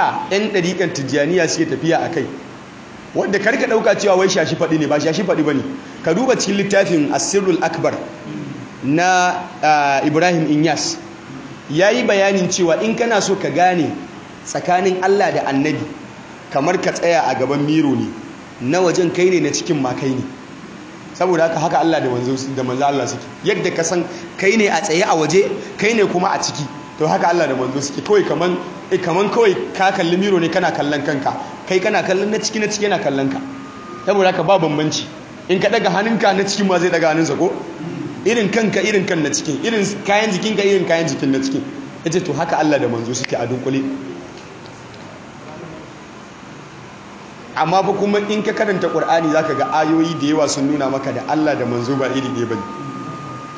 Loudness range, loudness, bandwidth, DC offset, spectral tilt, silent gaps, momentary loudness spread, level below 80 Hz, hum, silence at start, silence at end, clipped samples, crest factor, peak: 3 LU; -17 LUFS; 8 kHz; under 0.1%; -4.5 dB/octave; none; 17 LU; -56 dBFS; none; 0 s; 0 s; under 0.1%; 16 dB; -2 dBFS